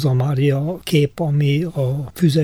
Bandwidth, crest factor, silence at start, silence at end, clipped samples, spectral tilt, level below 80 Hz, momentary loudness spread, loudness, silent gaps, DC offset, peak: 15.5 kHz; 12 dB; 0 s; 0 s; under 0.1%; -7.5 dB/octave; -50 dBFS; 5 LU; -19 LUFS; none; under 0.1%; -4 dBFS